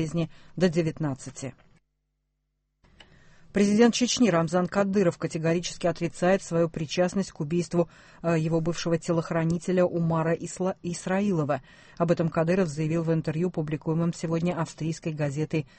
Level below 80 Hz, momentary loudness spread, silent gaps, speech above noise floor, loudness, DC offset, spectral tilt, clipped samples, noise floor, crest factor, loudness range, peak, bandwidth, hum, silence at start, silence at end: -56 dBFS; 9 LU; none; 51 dB; -27 LUFS; under 0.1%; -6 dB/octave; under 0.1%; -77 dBFS; 18 dB; 4 LU; -8 dBFS; 8.8 kHz; none; 0 s; 0.15 s